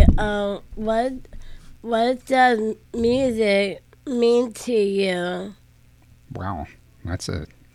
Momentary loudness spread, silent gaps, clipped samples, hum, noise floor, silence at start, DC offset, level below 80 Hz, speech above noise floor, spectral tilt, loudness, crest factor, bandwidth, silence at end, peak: 17 LU; none; under 0.1%; none; -52 dBFS; 0 s; under 0.1%; -30 dBFS; 31 dB; -6 dB/octave; -22 LUFS; 22 dB; 14 kHz; 0.3 s; 0 dBFS